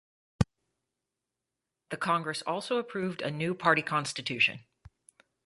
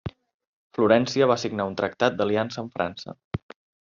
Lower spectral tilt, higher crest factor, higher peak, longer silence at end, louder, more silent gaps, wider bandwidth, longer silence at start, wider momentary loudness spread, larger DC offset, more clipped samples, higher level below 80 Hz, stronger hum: about the same, -4.5 dB/octave vs -4.5 dB/octave; about the same, 26 dB vs 22 dB; about the same, -6 dBFS vs -4 dBFS; first, 0.85 s vs 0.45 s; second, -30 LUFS vs -24 LUFS; second, none vs 0.34-0.40 s, 0.47-0.70 s, 3.24-3.31 s; first, 11.5 kHz vs 7.4 kHz; first, 0.4 s vs 0.05 s; second, 8 LU vs 16 LU; neither; neither; about the same, -54 dBFS vs -58 dBFS; neither